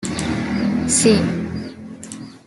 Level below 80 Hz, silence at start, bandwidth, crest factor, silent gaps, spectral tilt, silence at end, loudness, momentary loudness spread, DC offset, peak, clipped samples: -46 dBFS; 0 s; 12 kHz; 18 dB; none; -4.5 dB/octave; 0.1 s; -18 LUFS; 20 LU; under 0.1%; -2 dBFS; under 0.1%